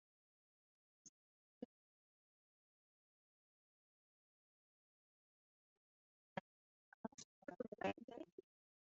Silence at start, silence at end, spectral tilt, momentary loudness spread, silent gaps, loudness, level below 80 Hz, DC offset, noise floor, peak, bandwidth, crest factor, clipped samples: 1.05 s; 0.5 s; -4 dB/octave; 21 LU; 1.09-7.04 s, 7.14-7.18 s, 7.24-7.42 s, 7.68-7.72 s, 8.04-8.08 s, 8.32-8.38 s; -53 LUFS; under -90 dBFS; under 0.1%; under -90 dBFS; -28 dBFS; 7 kHz; 30 dB; under 0.1%